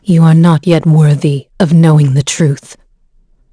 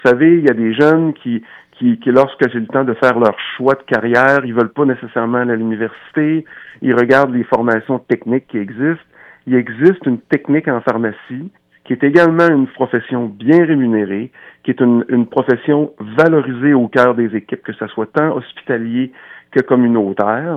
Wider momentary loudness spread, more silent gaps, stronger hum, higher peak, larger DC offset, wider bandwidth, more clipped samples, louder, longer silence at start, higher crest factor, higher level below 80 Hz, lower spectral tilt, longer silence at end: second, 7 LU vs 11 LU; neither; neither; about the same, 0 dBFS vs 0 dBFS; neither; first, 11 kHz vs 7.6 kHz; neither; first, -9 LUFS vs -14 LUFS; about the same, 0.05 s vs 0.05 s; about the same, 10 dB vs 14 dB; first, -46 dBFS vs -62 dBFS; about the same, -7 dB/octave vs -8 dB/octave; first, 0.8 s vs 0 s